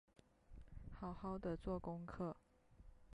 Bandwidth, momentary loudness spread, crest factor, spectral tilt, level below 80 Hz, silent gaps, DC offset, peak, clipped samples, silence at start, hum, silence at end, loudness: 11 kHz; 22 LU; 16 dB; -9 dB/octave; -60 dBFS; none; under 0.1%; -34 dBFS; under 0.1%; 0.5 s; none; 0 s; -48 LUFS